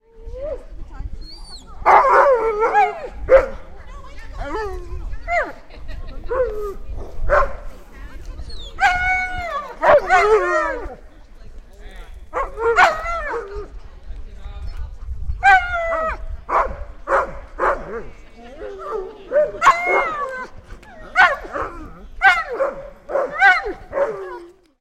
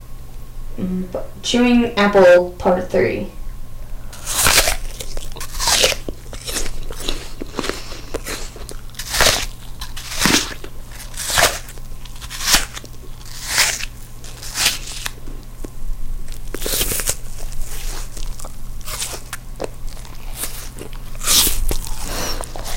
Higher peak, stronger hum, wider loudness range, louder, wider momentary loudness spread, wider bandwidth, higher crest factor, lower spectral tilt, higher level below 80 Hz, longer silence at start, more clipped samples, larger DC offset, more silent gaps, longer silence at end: about the same, 0 dBFS vs 0 dBFS; neither; about the same, 7 LU vs 9 LU; about the same, -18 LUFS vs -18 LUFS; about the same, 23 LU vs 22 LU; second, 13.5 kHz vs 17 kHz; about the same, 20 dB vs 20 dB; first, -4 dB/octave vs -2.5 dB/octave; about the same, -32 dBFS vs -28 dBFS; first, 0.15 s vs 0 s; neither; neither; neither; first, 0.3 s vs 0 s